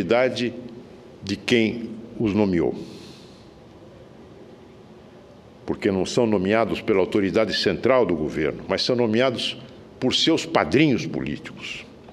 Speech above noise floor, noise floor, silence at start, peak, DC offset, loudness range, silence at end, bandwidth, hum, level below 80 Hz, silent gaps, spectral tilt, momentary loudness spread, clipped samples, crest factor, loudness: 25 dB; -46 dBFS; 0 s; -4 dBFS; under 0.1%; 8 LU; 0 s; 12.5 kHz; none; -52 dBFS; none; -5 dB/octave; 17 LU; under 0.1%; 20 dB; -22 LUFS